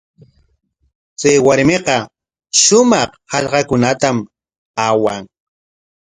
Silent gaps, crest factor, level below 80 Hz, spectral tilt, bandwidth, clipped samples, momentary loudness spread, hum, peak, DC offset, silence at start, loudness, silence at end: 4.58-4.74 s; 16 dB; -50 dBFS; -3.5 dB/octave; 11 kHz; under 0.1%; 13 LU; none; 0 dBFS; under 0.1%; 1.2 s; -14 LUFS; 0.85 s